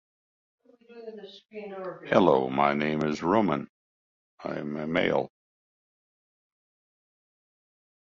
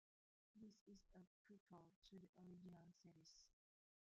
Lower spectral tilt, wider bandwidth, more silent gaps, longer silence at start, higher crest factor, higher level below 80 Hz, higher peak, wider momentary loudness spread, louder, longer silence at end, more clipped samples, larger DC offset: about the same, -7 dB/octave vs -6 dB/octave; about the same, 7.6 kHz vs 7.2 kHz; first, 3.69-4.38 s vs 0.81-0.86 s, 1.27-1.45 s, 1.60-1.66 s, 1.96-2.02 s, 2.29-2.33 s; first, 0.9 s vs 0.55 s; first, 24 dB vs 16 dB; first, -64 dBFS vs -88 dBFS; first, -6 dBFS vs -52 dBFS; first, 21 LU vs 5 LU; first, -26 LUFS vs -67 LUFS; first, 2.85 s vs 0.55 s; neither; neither